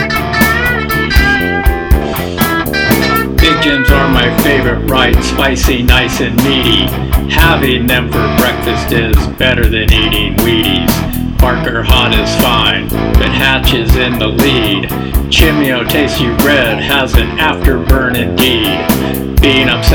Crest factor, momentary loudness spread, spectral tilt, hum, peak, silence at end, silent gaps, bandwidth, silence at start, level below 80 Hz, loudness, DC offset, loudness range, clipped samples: 10 dB; 4 LU; -5 dB/octave; none; 0 dBFS; 0 s; none; 20 kHz; 0 s; -16 dBFS; -10 LUFS; under 0.1%; 1 LU; 0.8%